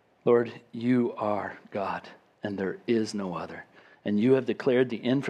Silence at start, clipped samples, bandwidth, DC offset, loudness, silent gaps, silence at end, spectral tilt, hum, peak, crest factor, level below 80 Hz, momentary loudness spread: 0.25 s; under 0.1%; 9.8 kHz; under 0.1%; -28 LUFS; none; 0 s; -7 dB/octave; none; -10 dBFS; 18 dB; -74 dBFS; 13 LU